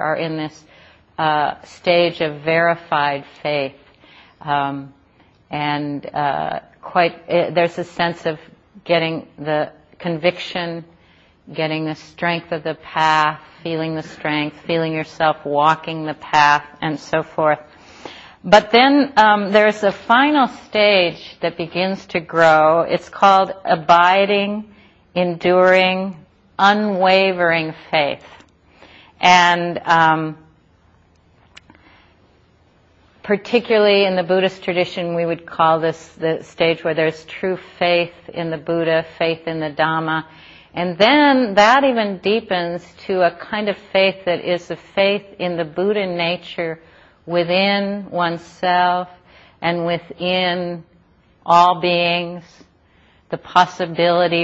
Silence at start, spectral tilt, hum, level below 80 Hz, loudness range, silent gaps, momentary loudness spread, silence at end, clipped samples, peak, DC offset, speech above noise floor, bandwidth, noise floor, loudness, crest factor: 0 s; -5 dB/octave; none; -58 dBFS; 7 LU; none; 13 LU; 0 s; under 0.1%; 0 dBFS; under 0.1%; 37 dB; 8 kHz; -54 dBFS; -17 LUFS; 18 dB